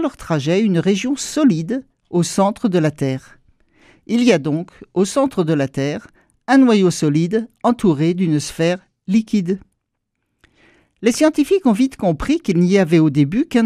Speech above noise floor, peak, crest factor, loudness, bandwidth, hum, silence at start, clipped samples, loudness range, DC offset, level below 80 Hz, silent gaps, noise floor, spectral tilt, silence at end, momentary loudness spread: 58 dB; 0 dBFS; 18 dB; -17 LUFS; 14.5 kHz; none; 0 s; under 0.1%; 3 LU; under 0.1%; -46 dBFS; none; -74 dBFS; -6 dB/octave; 0 s; 9 LU